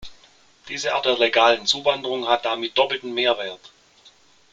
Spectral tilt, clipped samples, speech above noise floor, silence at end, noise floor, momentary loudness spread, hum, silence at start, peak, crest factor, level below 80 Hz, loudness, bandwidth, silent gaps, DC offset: -2 dB/octave; under 0.1%; 33 dB; 0.95 s; -54 dBFS; 11 LU; none; 0 s; -2 dBFS; 20 dB; -60 dBFS; -20 LUFS; 9.2 kHz; none; under 0.1%